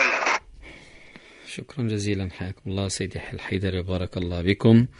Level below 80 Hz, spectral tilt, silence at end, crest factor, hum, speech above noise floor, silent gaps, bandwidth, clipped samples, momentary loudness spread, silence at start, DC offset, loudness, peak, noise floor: -48 dBFS; -5.5 dB/octave; 0.1 s; 20 dB; none; 23 dB; none; 11 kHz; under 0.1%; 23 LU; 0 s; under 0.1%; -26 LUFS; -6 dBFS; -48 dBFS